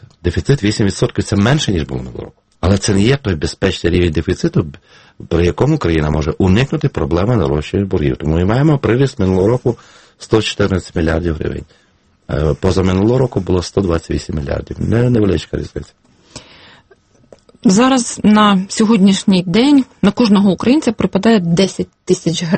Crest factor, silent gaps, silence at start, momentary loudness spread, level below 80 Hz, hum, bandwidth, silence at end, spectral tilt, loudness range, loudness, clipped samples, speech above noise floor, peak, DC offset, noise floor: 14 dB; none; 0.25 s; 10 LU; -32 dBFS; none; 8.8 kHz; 0 s; -6 dB/octave; 6 LU; -14 LUFS; under 0.1%; 37 dB; 0 dBFS; under 0.1%; -50 dBFS